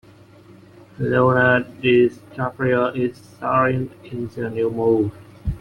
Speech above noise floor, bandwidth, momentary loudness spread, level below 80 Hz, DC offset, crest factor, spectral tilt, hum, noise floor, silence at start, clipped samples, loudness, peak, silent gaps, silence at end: 27 dB; 10.5 kHz; 13 LU; -44 dBFS; under 0.1%; 18 dB; -8 dB/octave; none; -47 dBFS; 1 s; under 0.1%; -20 LUFS; -2 dBFS; none; 0 s